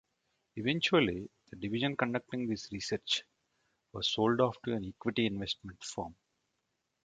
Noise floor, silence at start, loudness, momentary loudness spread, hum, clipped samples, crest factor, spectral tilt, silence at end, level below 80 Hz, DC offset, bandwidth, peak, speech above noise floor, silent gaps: -83 dBFS; 0.55 s; -33 LUFS; 14 LU; none; under 0.1%; 22 dB; -4.5 dB/octave; 0.9 s; -62 dBFS; under 0.1%; 9.4 kHz; -12 dBFS; 49 dB; none